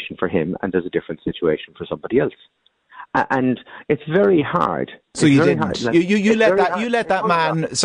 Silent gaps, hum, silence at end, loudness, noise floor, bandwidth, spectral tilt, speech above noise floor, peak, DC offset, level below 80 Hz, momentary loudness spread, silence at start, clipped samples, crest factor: none; none; 0 s; -19 LUFS; -43 dBFS; 10 kHz; -5.5 dB/octave; 24 dB; -4 dBFS; under 0.1%; -52 dBFS; 11 LU; 0 s; under 0.1%; 14 dB